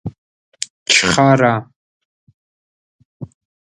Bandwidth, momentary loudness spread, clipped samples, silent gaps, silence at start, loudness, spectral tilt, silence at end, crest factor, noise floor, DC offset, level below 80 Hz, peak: 11.5 kHz; 25 LU; under 0.1%; 0.18-0.52 s, 0.70-0.86 s, 1.76-2.27 s, 2.34-2.99 s, 3.05-3.20 s; 0.05 s; -14 LUFS; -3.5 dB/octave; 0.45 s; 20 dB; under -90 dBFS; under 0.1%; -50 dBFS; 0 dBFS